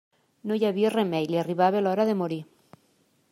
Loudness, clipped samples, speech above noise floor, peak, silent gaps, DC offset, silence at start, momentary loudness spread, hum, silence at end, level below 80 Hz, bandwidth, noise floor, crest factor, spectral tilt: -25 LUFS; under 0.1%; 42 dB; -8 dBFS; none; under 0.1%; 0.45 s; 9 LU; none; 0.9 s; -76 dBFS; 14.5 kHz; -66 dBFS; 18 dB; -7 dB/octave